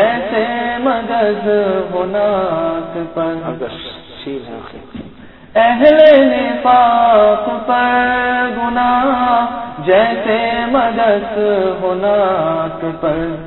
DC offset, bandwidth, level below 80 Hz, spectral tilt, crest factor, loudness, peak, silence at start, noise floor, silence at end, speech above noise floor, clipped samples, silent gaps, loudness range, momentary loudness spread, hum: 0.5%; 5.4 kHz; -44 dBFS; -8.5 dB/octave; 14 dB; -13 LUFS; 0 dBFS; 0 s; -37 dBFS; 0 s; 24 dB; under 0.1%; none; 9 LU; 16 LU; none